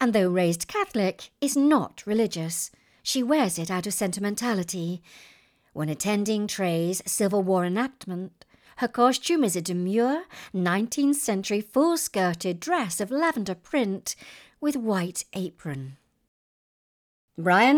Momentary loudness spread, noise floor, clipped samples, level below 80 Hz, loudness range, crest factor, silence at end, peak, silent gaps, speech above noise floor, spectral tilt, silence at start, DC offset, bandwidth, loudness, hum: 11 LU; under -90 dBFS; under 0.1%; -66 dBFS; 4 LU; 18 dB; 0 s; -8 dBFS; 16.28-17.28 s; over 65 dB; -4.5 dB/octave; 0 s; under 0.1%; over 20 kHz; -26 LUFS; none